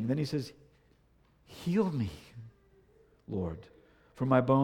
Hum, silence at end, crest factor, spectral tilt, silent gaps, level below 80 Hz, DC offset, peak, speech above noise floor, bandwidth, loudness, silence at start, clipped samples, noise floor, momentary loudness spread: none; 0 s; 20 dB; -8 dB/octave; none; -60 dBFS; under 0.1%; -12 dBFS; 36 dB; 15 kHz; -33 LUFS; 0 s; under 0.1%; -66 dBFS; 23 LU